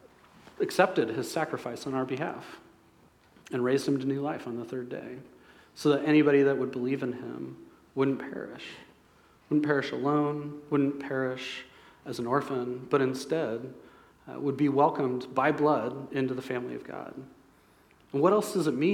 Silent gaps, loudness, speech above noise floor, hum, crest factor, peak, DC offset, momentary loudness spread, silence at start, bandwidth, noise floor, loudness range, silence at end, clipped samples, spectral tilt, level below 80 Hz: none; -29 LUFS; 32 dB; none; 22 dB; -8 dBFS; under 0.1%; 16 LU; 0.6 s; 14.5 kHz; -61 dBFS; 5 LU; 0 s; under 0.1%; -6.5 dB/octave; -72 dBFS